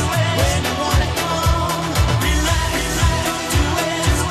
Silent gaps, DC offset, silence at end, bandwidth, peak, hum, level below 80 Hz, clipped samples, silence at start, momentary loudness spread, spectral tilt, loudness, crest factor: none; under 0.1%; 0 s; 14 kHz; -4 dBFS; none; -24 dBFS; under 0.1%; 0 s; 2 LU; -4 dB/octave; -18 LUFS; 14 dB